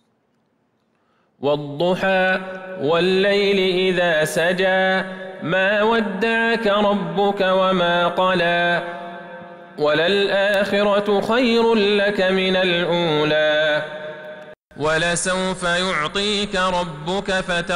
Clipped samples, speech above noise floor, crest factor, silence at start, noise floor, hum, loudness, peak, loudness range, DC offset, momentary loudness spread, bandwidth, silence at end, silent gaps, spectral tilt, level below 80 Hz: under 0.1%; 47 dB; 10 dB; 1.4 s; -65 dBFS; none; -18 LUFS; -8 dBFS; 3 LU; under 0.1%; 9 LU; 15.5 kHz; 0 s; 14.57-14.66 s; -4.5 dB/octave; -50 dBFS